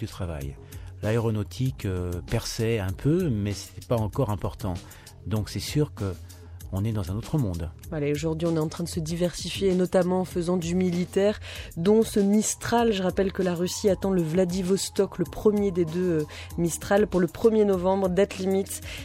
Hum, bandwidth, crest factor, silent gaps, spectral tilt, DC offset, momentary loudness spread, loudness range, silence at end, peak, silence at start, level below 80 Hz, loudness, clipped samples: none; 16 kHz; 18 dB; none; -6 dB/octave; under 0.1%; 11 LU; 6 LU; 0 s; -8 dBFS; 0 s; -46 dBFS; -26 LUFS; under 0.1%